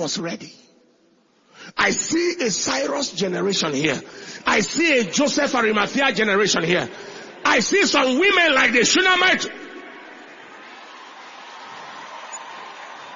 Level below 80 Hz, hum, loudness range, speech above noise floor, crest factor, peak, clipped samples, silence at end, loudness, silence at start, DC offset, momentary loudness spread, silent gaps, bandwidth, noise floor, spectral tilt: -60 dBFS; none; 8 LU; 39 dB; 20 dB; -2 dBFS; under 0.1%; 0 s; -18 LUFS; 0 s; under 0.1%; 24 LU; none; 7.6 kHz; -59 dBFS; -2.5 dB/octave